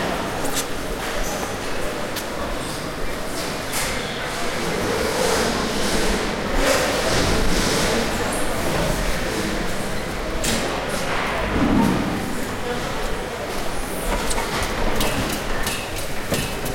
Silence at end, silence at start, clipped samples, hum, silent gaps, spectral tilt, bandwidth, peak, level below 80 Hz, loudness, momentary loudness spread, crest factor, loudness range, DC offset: 0 s; 0 s; under 0.1%; none; none; -3.5 dB/octave; 16.5 kHz; -6 dBFS; -30 dBFS; -23 LUFS; 7 LU; 16 dB; 5 LU; under 0.1%